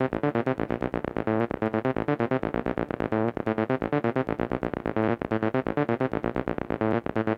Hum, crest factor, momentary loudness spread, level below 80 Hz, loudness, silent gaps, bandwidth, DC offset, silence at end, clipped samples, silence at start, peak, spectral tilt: none; 18 dB; 3 LU; -50 dBFS; -28 LUFS; none; 6.4 kHz; under 0.1%; 0 s; under 0.1%; 0 s; -10 dBFS; -9.5 dB/octave